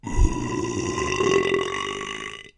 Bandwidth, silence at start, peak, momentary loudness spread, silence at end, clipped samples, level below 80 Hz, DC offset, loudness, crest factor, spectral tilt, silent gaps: 10.5 kHz; 0.05 s; -4 dBFS; 9 LU; 0.1 s; under 0.1%; -30 dBFS; under 0.1%; -25 LUFS; 20 dB; -4.5 dB/octave; none